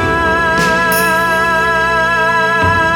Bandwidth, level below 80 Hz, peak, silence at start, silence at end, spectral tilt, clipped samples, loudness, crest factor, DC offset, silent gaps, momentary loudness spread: 19 kHz; -32 dBFS; 0 dBFS; 0 s; 0 s; -4 dB/octave; under 0.1%; -11 LUFS; 12 dB; under 0.1%; none; 1 LU